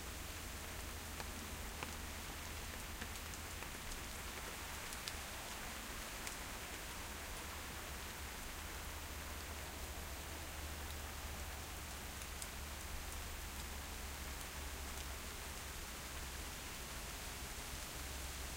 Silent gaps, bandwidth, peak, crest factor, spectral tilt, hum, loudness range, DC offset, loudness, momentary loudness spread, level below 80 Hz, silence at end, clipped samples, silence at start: none; 16.5 kHz; -22 dBFS; 24 dB; -2.5 dB/octave; none; 1 LU; under 0.1%; -47 LUFS; 1 LU; -52 dBFS; 0 s; under 0.1%; 0 s